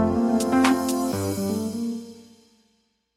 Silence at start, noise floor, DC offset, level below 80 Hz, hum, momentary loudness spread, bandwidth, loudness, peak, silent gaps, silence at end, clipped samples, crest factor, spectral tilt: 0 s; -68 dBFS; under 0.1%; -52 dBFS; none; 11 LU; 16.5 kHz; -23 LUFS; -4 dBFS; none; 0.95 s; under 0.1%; 20 dB; -5 dB/octave